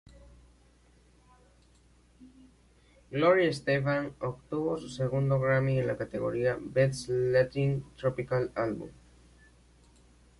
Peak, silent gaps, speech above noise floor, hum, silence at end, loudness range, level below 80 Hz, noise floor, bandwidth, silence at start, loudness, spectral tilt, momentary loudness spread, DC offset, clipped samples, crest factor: -12 dBFS; none; 33 dB; 60 Hz at -55 dBFS; 1.45 s; 4 LU; -58 dBFS; -62 dBFS; 11.5 kHz; 2.2 s; -29 LUFS; -7 dB/octave; 8 LU; under 0.1%; under 0.1%; 20 dB